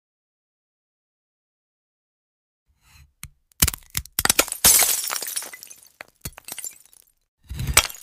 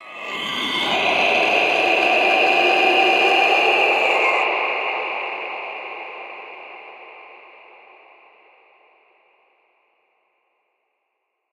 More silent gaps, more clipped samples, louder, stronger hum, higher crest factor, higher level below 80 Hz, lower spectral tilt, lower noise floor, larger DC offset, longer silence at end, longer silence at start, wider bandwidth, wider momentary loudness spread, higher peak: first, 7.28-7.38 s vs none; neither; about the same, -19 LUFS vs -17 LUFS; neither; first, 26 dB vs 18 dB; first, -42 dBFS vs -68 dBFS; second, -0.5 dB/octave vs -2 dB/octave; second, -55 dBFS vs -75 dBFS; neither; second, 0.05 s vs 4.15 s; first, 3.25 s vs 0 s; about the same, 16 kHz vs 15.5 kHz; first, 23 LU vs 20 LU; first, 0 dBFS vs -4 dBFS